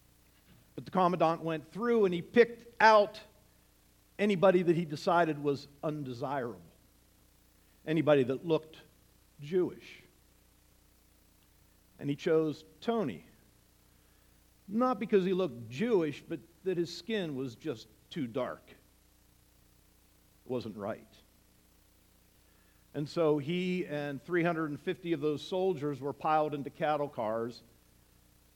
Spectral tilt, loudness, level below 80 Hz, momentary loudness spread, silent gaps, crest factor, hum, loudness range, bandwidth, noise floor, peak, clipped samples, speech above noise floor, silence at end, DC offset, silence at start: -6.5 dB/octave; -32 LUFS; -68 dBFS; 15 LU; none; 24 dB; none; 14 LU; 18 kHz; -65 dBFS; -8 dBFS; under 0.1%; 34 dB; 0.95 s; under 0.1%; 0.75 s